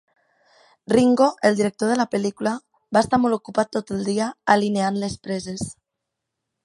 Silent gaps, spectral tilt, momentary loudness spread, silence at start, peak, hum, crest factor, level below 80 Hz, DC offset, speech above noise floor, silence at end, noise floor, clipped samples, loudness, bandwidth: none; -5.5 dB/octave; 11 LU; 0.9 s; -2 dBFS; none; 20 dB; -56 dBFS; under 0.1%; 61 dB; 0.9 s; -82 dBFS; under 0.1%; -21 LUFS; 11.5 kHz